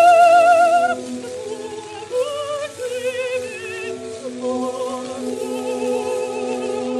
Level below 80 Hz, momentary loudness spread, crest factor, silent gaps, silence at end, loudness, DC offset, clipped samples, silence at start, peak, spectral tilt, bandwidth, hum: -66 dBFS; 17 LU; 16 dB; none; 0 s; -20 LUFS; under 0.1%; under 0.1%; 0 s; -2 dBFS; -3.5 dB/octave; 13 kHz; none